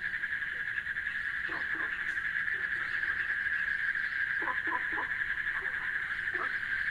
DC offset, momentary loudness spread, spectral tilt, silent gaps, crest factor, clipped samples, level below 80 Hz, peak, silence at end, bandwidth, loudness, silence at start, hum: under 0.1%; 3 LU; -3 dB/octave; none; 16 dB; under 0.1%; -60 dBFS; -18 dBFS; 0 s; 14 kHz; -32 LUFS; 0 s; none